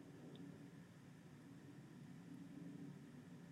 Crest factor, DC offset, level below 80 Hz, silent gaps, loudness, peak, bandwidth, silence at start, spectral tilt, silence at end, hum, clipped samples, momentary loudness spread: 14 dB; under 0.1%; -88 dBFS; none; -59 LUFS; -44 dBFS; 14.5 kHz; 0 s; -6.5 dB/octave; 0 s; none; under 0.1%; 6 LU